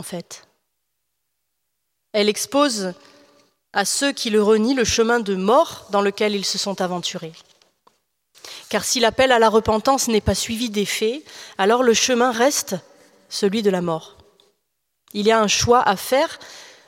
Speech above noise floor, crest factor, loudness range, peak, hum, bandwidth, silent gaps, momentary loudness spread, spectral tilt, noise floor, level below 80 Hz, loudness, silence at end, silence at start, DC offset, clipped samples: 57 dB; 20 dB; 5 LU; -2 dBFS; none; 16.5 kHz; none; 16 LU; -3 dB/octave; -76 dBFS; -48 dBFS; -19 LUFS; 0.2 s; 0 s; under 0.1%; under 0.1%